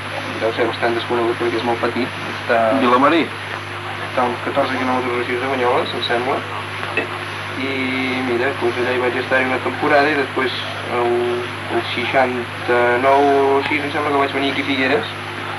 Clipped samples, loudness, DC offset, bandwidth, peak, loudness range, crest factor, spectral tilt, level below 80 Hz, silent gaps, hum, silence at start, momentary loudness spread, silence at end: under 0.1%; -18 LUFS; under 0.1%; 13 kHz; -4 dBFS; 3 LU; 16 dB; -5 dB/octave; -64 dBFS; none; none; 0 s; 9 LU; 0 s